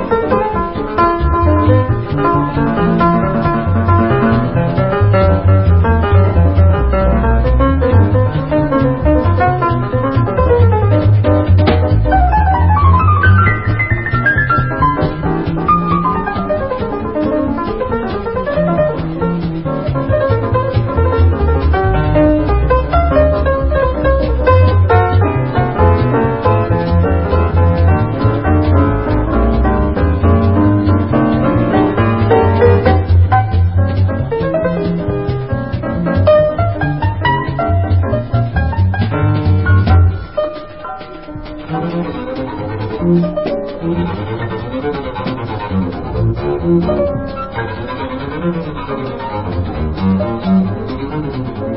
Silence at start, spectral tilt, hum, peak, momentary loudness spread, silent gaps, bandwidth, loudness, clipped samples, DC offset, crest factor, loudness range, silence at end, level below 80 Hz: 0 s; -13 dB/octave; none; 0 dBFS; 10 LU; none; 5.6 kHz; -14 LUFS; under 0.1%; 0.9%; 12 dB; 7 LU; 0 s; -20 dBFS